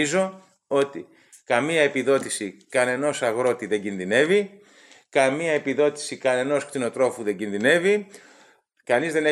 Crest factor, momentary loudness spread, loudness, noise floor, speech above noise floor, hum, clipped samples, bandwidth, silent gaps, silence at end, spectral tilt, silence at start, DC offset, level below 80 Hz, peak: 20 dB; 9 LU; -23 LUFS; -57 dBFS; 34 dB; none; under 0.1%; 13 kHz; none; 0 s; -4 dB/octave; 0 s; under 0.1%; -74 dBFS; -4 dBFS